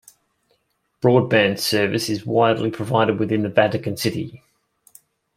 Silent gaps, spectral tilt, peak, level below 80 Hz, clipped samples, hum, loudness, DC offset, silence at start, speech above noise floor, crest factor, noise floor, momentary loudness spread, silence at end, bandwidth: none; -5.5 dB/octave; -2 dBFS; -60 dBFS; under 0.1%; none; -20 LUFS; under 0.1%; 1.05 s; 50 dB; 20 dB; -69 dBFS; 7 LU; 1 s; 16 kHz